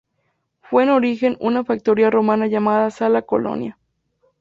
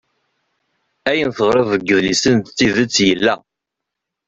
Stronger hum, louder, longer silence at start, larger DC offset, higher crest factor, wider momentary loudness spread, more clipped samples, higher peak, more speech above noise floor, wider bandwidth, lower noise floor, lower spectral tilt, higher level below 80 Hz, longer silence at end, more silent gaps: neither; about the same, -18 LUFS vs -16 LUFS; second, 0.7 s vs 1.05 s; neither; about the same, 16 dB vs 16 dB; about the same, 6 LU vs 5 LU; neither; about the same, -4 dBFS vs -2 dBFS; second, 53 dB vs 66 dB; about the same, 7.6 kHz vs 8.2 kHz; second, -70 dBFS vs -81 dBFS; first, -7.5 dB/octave vs -4 dB/octave; second, -60 dBFS vs -50 dBFS; second, 0.7 s vs 0.9 s; neither